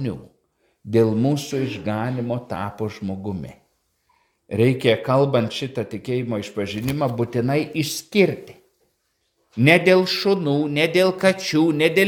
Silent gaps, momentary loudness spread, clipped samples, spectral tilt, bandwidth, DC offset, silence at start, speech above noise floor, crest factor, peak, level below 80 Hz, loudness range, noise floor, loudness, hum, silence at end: none; 12 LU; under 0.1%; -6 dB/octave; 18.5 kHz; under 0.1%; 0 s; 50 dB; 22 dB; 0 dBFS; -58 dBFS; 6 LU; -70 dBFS; -21 LUFS; none; 0 s